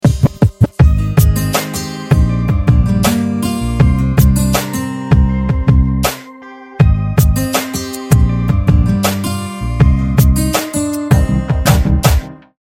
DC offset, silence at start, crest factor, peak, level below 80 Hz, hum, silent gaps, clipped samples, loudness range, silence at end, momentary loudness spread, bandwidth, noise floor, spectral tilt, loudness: under 0.1%; 0.05 s; 12 dB; 0 dBFS; -18 dBFS; none; none; 0.3%; 1 LU; 0.25 s; 8 LU; 17 kHz; -34 dBFS; -6 dB/octave; -13 LUFS